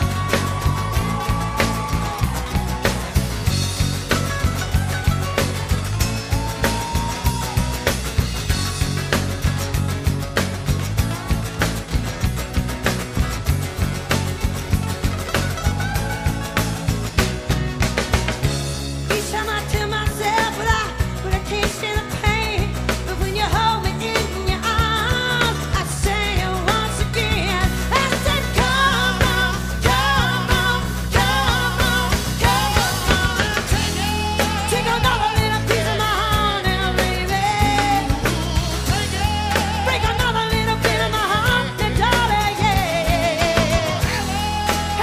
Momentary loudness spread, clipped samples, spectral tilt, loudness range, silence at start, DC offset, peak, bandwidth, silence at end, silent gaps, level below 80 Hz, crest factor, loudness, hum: 5 LU; under 0.1%; -4 dB/octave; 4 LU; 0 s; under 0.1%; 0 dBFS; 15.5 kHz; 0 s; none; -26 dBFS; 18 dB; -20 LUFS; none